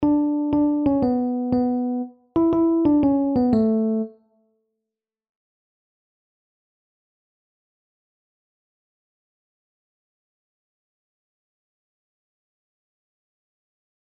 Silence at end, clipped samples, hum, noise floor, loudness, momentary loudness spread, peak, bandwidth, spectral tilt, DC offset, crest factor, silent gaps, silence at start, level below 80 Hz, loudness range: 9.95 s; under 0.1%; none; -86 dBFS; -21 LUFS; 9 LU; -8 dBFS; 4.9 kHz; -11 dB/octave; under 0.1%; 16 dB; none; 0 s; -54 dBFS; 9 LU